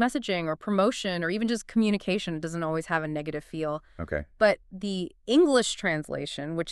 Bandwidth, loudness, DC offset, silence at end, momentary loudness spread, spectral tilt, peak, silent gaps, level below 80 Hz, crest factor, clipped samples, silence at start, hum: 12.5 kHz; -28 LUFS; under 0.1%; 0 s; 11 LU; -5 dB/octave; -8 dBFS; none; -52 dBFS; 18 dB; under 0.1%; 0 s; none